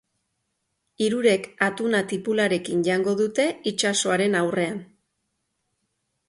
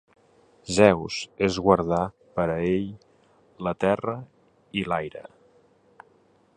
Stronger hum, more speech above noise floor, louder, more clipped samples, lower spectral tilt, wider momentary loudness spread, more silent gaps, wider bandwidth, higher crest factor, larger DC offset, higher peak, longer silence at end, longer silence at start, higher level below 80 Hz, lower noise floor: neither; first, 54 dB vs 37 dB; about the same, -23 LUFS vs -25 LUFS; neither; second, -4 dB/octave vs -5.5 dB/octave; second, 4 LU vs 17 LU; neither; about the same, 11.5 kHz vs 11 kHz; second, 20 dB vs 26 dB; neither; about the same, -4 dBFS vs -2 dBFS; about the same, 1.45 s vs 1.35 s; first, 1 s vs 0.65 s; second, -68 dBFS vs -52 dBFS; first, -76 dBFS vs -61 dBFS